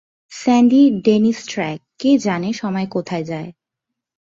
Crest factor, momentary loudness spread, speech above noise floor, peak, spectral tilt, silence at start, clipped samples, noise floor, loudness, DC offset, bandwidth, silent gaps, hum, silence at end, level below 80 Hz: 16 dB; 14 LU; 65 dB; -2 dBFS; -6 dB/octave; 0.3 s; under 0.1%; -81 dBFS; -17 LUFS; under 0.1%; 7.6 kHz; none; none; 0.75 s; -60 dBFS